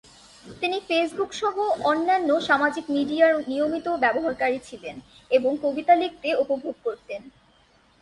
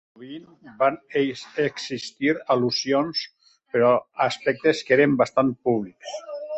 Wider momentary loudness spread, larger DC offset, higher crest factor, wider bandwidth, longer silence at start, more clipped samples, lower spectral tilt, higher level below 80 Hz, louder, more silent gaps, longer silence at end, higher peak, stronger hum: about the same, 13 LU vs 15 LU; neither; about the same, 18 dB vs 18 dB; first, 11.5 kHz vs 8.2 kHz; first, 0.45 s vs 0.2 s; neither; about the same, -4 dB/octave vs -5 dB/octave; about the same, -62 dBFS vs -66 dBFS; about the same, -23 LUFS vs -23 LUFS; neither; first, 0.7 s vs 0 s; about the same, -6 dBFS vs -6 dBFS; neither